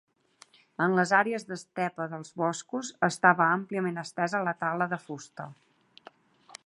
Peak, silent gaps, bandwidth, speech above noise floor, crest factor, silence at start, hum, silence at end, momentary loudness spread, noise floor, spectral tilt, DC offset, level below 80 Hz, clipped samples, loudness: -6 dBFS; none; 11.5 kHz; 31 dB; 24 dB; 0.8 s; none; 1.15 s; 17 LU; -60 dBFS; -5 dB/octave; under 0.1%; -80 dBFS; under 0.1%; -28 LUFS